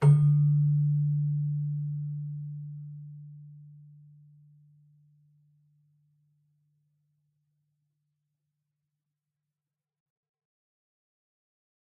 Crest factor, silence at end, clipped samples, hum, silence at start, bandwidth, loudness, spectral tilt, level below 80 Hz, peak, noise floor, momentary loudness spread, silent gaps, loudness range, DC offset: 20 dB; 8.1 s; under 0.1%; none; 0 s; 2.3 kHz; -27 LUFS; -12 dB/octave; -72 dBFS; -12 dBFS; under -90 dBFS; 24 LU; none; 24 LU; under 0.1%